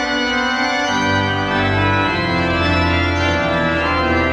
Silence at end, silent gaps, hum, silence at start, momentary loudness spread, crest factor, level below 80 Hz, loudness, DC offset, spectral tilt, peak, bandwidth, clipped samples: 0 s; none; none; 0 s; 2 LU; 12 dB; -32 dBFS; -16 LUFS; under 0.1%; -5 dB/octave; -4 dBFS; 9.4 kHz; under 0.1%